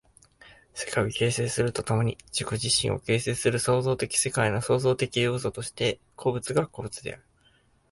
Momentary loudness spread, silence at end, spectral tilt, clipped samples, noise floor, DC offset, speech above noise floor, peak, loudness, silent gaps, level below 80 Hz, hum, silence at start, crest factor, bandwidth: 9 LU; 0.75 s; -4 dB/octave; under 0.1%; -63 dBFS; under 0.1%; 37 dB; -10 dBFS; -27 LUFS; none; -54 dBFS; none; 0.45 s; 18 dB; 11.5 kHz